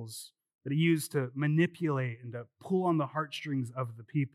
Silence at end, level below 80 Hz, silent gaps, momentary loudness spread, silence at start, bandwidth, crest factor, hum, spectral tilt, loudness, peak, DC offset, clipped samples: 0.05 s; under -90 dBFS; 0.54-0.59 s; 16 LU; 0 s; 14.5 kHz; 18 dB; none; -6.5 dB/octave; -32 LUFS; -14 dBFS; under 0.1%; under 0.1%